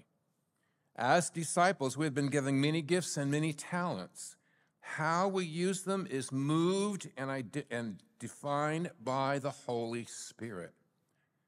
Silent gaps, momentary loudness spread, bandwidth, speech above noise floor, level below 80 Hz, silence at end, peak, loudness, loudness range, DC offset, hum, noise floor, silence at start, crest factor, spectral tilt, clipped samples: none; 14 LU; 15.5 kHz; 45 dB; -86 dBFS; 0.8 s; -14 dBFS; -34 LUFS; 5 LU; under 0.1%; none; -79 dBFS; 1 s; 20 dB; -5 dB/octave; under 0.1%